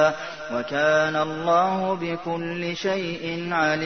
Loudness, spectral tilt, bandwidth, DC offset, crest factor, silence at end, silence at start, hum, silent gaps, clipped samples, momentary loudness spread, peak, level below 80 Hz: -24 LUFS; -5 dB/octave; 6.6 kHz; 0.2%; 18 dB; 0 s; 0 s; none; none; under 0.1%; 9 LU; -6 dBFS; -62 dBFS